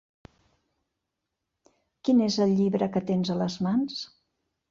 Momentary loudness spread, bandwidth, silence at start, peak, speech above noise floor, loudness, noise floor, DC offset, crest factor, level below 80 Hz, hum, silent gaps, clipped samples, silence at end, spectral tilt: 10 LU; 7.4 kHz; 2.05 s; -12 dBFS; 59 dB; -26 LUFS; -84 dBFS; under 0.1%; 16 dB; -66 dBFS; none; none; under 0.1%; 0.65 s; -6.5 dB/octave